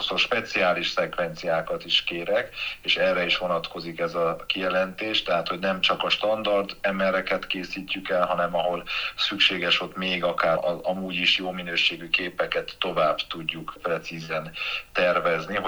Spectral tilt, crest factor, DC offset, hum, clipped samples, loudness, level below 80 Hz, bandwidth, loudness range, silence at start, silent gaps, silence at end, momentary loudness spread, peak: -4 dB/octave; 20 dB; under 0.1%; none; under 0.1%; -25 LUFS; -54 dBFS; over 20 kHz; 2 LU; 0 s; none; 0 s; 8 LU; -6 dBFS